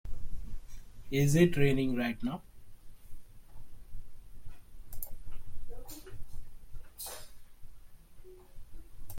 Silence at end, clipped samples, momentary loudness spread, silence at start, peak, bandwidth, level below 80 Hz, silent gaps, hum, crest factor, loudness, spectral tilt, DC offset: 0 s; under 0.1%; 29 LU; 0.05 s; -12 dBFS; 16.5 kHz; -46 dBFS; none; none; 20 dB; -31 LUFS; -6 dB/octave; under 0.1%